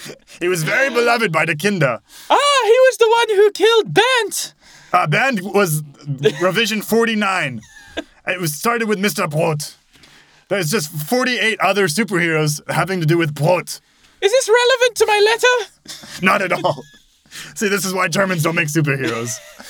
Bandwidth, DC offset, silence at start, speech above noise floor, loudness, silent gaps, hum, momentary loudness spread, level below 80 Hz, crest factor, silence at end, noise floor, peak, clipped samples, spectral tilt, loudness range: over 20 kHz; under 0.1%; 0 s; 31 dB; -16 LUFS; none; none; 13 LU; -60 dBFS; 16 dB; 0 s; -48 dBFS; 0 dBFS; under 0.1%; -4 dB/octave; 5 LU